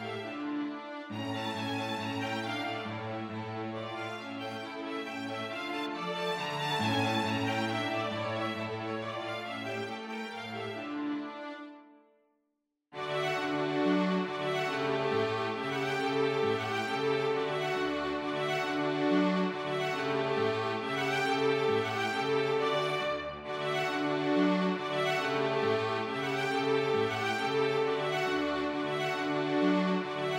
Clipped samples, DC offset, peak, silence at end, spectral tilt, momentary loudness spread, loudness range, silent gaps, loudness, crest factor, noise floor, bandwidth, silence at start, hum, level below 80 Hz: under 0.1%; under 0.1%; -16 dBFS; 0 s; -5.5 dB/octave; 9 LU; 7 LU; none; -32 LUFS; 16 dB; -82 dBFS; 16 kHz; 0 s; none; -70 dBFS